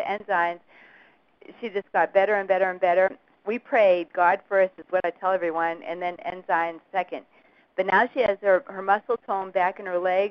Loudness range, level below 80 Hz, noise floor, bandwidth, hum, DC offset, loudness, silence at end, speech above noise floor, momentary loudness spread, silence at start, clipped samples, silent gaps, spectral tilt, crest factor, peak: 4 LU; -68 dBFS; -57 dBFS; 6 kHz; none; under 0.1%; -24 LUFS; 0 s; 33 dB; 11 LU; 0 s; under 0.1%; none; -2 dB/octave; 18 dB; -6 dBFS